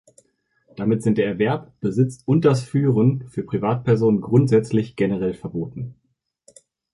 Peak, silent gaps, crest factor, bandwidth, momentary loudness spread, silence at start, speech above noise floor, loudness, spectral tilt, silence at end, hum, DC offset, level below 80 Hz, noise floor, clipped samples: -4 dBFS; none; 18 dB; 11.5 kHz; 11 LU; 0.8 s; 46 dB; -21 LUFS; -8.5 dB/octave; 1 s; none; under 0.1%; -54 dBFS; -65 dBFS; under 0.1%